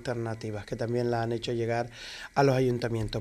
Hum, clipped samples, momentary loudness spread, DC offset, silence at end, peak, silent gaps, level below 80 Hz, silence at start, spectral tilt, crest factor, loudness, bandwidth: none; under 0.1%; 12 LU; under 0.1%; 0 s; -10 dBFS; none; -52 dBFS; 0 s; -6.5 dB/octave; 18 dB; -30 LUFS; 13.5 kHz